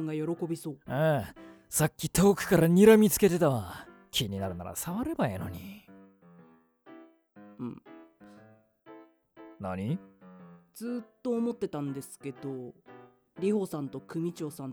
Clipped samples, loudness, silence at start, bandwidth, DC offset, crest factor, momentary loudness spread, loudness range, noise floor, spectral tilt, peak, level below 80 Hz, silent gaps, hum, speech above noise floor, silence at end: under 0.1%; -29 LUFS; 0 s; over 20 kHz; under 0.1%; 24 dB; 18 LU; 22 LU; -59 dBFS; -5.5 dB/octave; -8 dBFS; -58 dBFS; none; none; 31 dB; 0 s